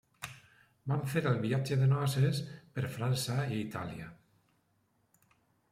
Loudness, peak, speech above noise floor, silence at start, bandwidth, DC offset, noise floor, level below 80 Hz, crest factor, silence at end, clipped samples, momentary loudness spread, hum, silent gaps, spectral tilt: -33 LUFS; -16 dBFS; 42 dB; 0.2 s; 15 kHz; under 0.1%; -74 dBFS; -68 dBFS; 18 dB; 1.55 s; under 0.1%; 17 LU; none; none; -6 dB/octave